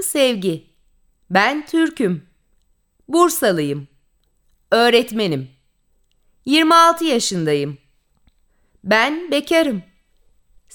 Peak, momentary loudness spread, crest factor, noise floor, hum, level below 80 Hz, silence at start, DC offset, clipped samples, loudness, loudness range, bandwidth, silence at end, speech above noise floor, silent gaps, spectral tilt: -2 dBFS; 16 LU; 18 dB; -62 dBFS; none; -60 dBFS; 0 s; under 0.1%; under 0.1%; -17 LUFS; 4 LU; over 20 kHz; 0.95 s; 45 dB; none; -4 dB/octave